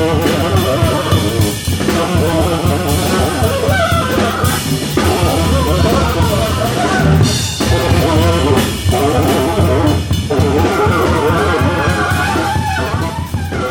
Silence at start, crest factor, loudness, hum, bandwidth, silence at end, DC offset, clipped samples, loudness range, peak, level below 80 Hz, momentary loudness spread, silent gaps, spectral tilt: 0 s; 12 dB; -13 LUFS; none; 19.5 kHz; 0 s; under 0.1%; under 0.1%; 1 LU; 0 dBFS; -26 dBFS; 4 LU; none; -5.5 dB/octave